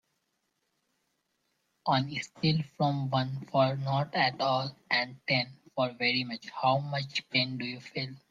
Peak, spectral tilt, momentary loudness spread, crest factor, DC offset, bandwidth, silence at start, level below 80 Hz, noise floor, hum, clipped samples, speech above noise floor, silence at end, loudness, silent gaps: -12 dBFS; -6 dB/octave; 9 LU; 20 dB; under 0.1%; 7.8 kHz; 1.85 s; -70 dBFS; -79 dBFS; none; under 0.1%; 48 dB; 0.15 s; -30 LUFS; none